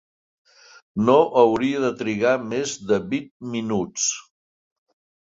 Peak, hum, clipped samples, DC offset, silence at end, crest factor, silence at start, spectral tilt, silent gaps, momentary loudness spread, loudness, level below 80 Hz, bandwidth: -4 dBFS; none; under 0.1%; under 0.1%; 1 s; 20 dB; 0.95 s; -4 dB/octave; 3.31-3.40 s; 12 LU; -21 LUFS; -60 dBFS; 7.8 kHz